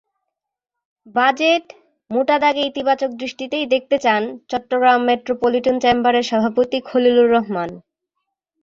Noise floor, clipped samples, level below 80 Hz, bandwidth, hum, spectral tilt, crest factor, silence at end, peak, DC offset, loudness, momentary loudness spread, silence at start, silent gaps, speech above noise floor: -83 dBFS; under 0.1%; -58 dBFS; 7.4 kHz; none; -4.5 dB/octave; 16 dB; 0.85 s; -2 dBFS; under 0.1%; -18 LUFS; 10 LU; 1.15 s; none; 66 dB